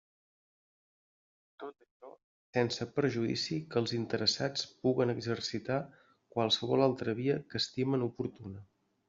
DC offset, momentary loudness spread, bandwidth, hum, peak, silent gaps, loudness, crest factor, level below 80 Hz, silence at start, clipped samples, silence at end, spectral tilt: under 0.1%; 18 LU; 7.6 kHz; none; -12 dBFS; 1.91-2.00 s, 2.24-2.53 s; -33 LUFS; 22 dB; -72 dBFS; 1.6 s; under 0.1%; 0.45 s; -4.5 dB/octave